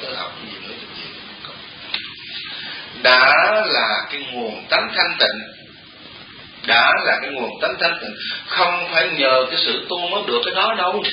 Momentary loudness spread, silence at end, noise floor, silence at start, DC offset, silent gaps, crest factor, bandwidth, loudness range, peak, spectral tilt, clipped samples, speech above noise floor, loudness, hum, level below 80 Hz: 19 LU; 0 s; -41 dBFS; 0 s; under 0.1%; none; 20 dB; 5.4 kHz; 3 LU; 0 dBFS; -5.5 dB/octave; under 0.1%; 23 dB; -17 LUFS; none; -62 dBFS